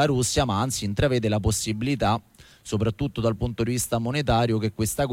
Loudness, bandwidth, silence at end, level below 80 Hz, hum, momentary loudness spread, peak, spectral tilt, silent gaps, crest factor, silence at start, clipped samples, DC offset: -25 LUFS; 16.5 kHz; 0 s; -40 dBFS; none; 4 LU; -10 dBFS; -5 dB/octave; none; 14 dB; 0 s; under 0.1%; under 0.1%